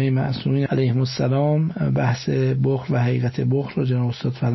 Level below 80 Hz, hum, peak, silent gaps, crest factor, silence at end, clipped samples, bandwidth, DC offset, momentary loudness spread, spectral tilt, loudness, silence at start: -52 dBFS; none; -10 dBFS; none; 12 dB; 0 s; under 0.1%; 6.2 kHz; under 0.1%; 2 LU; -8 dB/octave; -21 LUFS; 0 s